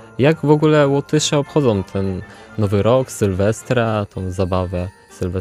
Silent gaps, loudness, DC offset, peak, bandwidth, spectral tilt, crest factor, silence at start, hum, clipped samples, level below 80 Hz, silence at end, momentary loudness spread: none; -18 LUFS; under 0.1%; -2 dBFS; 14 kHz; -6 dB/octave; 16 dB; 0 s; none; under 0.1%; -46 dBFS; 0 s; 12 LU